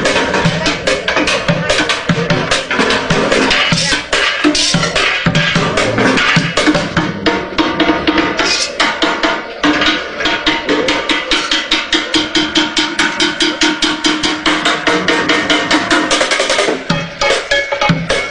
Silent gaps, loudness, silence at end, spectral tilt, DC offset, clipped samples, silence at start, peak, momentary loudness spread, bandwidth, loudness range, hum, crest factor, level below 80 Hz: none; -12 LUFS; 0 s; -3.5 dB/octave; under 0.1%; under 0.1%; 0 s; 0 dBFS; 3 LU; 10.5 kHz; 2 LU; none; 14 dB; -36 dBFS